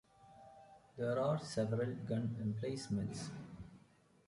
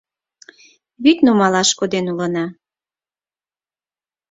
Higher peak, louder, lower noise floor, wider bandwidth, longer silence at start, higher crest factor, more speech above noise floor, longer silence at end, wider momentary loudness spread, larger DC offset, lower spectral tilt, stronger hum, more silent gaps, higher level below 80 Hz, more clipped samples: second, -24 dBFS vs -2 dBFS; second, -40 LUFS vs -16 LUFS; second, -68 dBFS vs under -90 dBFS; first, 11.5 kHz vs 7.8 kHz; second, 0.2 s vs 1 s; about the same, 18 dB vs 18 dB; second, 29 dB vs over 75 dB; second, 0.5 s vs 1.8 s; first, 22 LU vs 10 LU; neither; first, -6.5 dB/octave vs -4 dB/octave; neither; neither; second, -68 dBFS vs -62 dBFS; neither